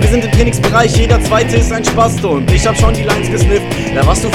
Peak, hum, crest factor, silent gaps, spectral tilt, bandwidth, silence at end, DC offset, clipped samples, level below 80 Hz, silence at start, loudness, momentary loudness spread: 0 dBFS; none; 10 dB; none; -5.5 dB/octave; 16.5 kHz; 0 s; under 0.1%; 0.5%; -18 dBFS; 0 s; -12 LUFS; 4 LU